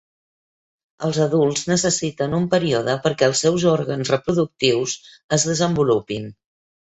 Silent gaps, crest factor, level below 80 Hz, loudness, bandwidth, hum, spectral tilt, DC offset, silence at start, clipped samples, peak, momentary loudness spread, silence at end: 5.24-5.29 s; 18 dB; -54 dBFS; -20 LUFS; 8.4 kHz; none; -4.5 dB/octave; under 0.1%; 1 s; under 0.1%; -2 dBFS; 8 LU; 0.6 s